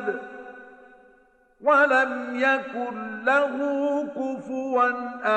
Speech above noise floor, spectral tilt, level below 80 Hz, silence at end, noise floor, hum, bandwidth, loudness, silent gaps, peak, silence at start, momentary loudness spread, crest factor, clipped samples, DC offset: 35 dB; -4.5 dB/octave; -74 dBFS; 0 s; -59 dBFS; none; 8.6 kHz; -24 LUFS; none; -8 dBFS; 0 s; 12 LU; 16 dB; under 0.1%; under 0.1%